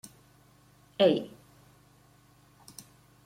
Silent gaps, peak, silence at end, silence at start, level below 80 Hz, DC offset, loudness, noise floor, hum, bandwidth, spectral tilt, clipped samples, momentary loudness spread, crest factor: none; -10 dBFS; 2 s; 1 s; -72 dBFS; under 0.1%; -27 LUFS; -61 dBFS; 50 Hz at -60 dBFS; 16 kHz; -5.5 dB/octave; under 0.1%; 25 LU; 24 dB